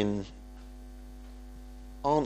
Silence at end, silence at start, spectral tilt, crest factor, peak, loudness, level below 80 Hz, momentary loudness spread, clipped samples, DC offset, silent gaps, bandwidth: 0 s; 0 s; -7 dB/octave; 20 dB; -14 dBFS; -34 LUFS; -46 dBFS; 17 LU; under 0.1%; under 0.1%; none; 15.5 kHz